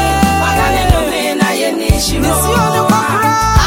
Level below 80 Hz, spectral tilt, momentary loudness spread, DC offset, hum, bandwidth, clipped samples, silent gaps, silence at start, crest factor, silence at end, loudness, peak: -20 dBFS; -4.5 dB/octave; 2 LU; under 0.1%; none; 17 kHz; under 0.1%; none; 0 s; 12 dB; 0 s; -12 LUFS; 0 dBFS